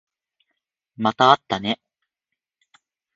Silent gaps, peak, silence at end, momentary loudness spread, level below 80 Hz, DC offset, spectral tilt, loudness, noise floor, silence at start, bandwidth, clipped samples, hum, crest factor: none; 0 dBFS; 1.4 s; 11 LU; -62 dBFS; under 0.1%; -5 dB/octave; -20 LUFS; -84 dBFS; 1 s; 7.6 kHz; under 0.1%; none; 24 dB